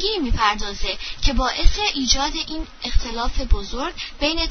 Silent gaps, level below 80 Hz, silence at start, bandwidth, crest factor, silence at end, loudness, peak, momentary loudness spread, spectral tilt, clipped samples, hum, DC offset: none; -22 dBFS; 0 s; 6.6 kHz; 20 dB; 0 s; -22 LUFS; 0 dBFS; 8 LU; -3 dB/octave; under 0.1%; none; under 0.1%